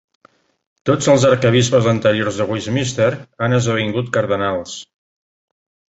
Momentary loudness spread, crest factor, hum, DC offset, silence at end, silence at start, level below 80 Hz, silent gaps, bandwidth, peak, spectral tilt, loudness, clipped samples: 10 LU; 16 dB; none; under 0.1%; 1.1 s; 0.85 s; -50 dBFS; none; 8.2 kHz; -2 dBFS; -5.5 dB/octave; -17 LUFS; under 0.1%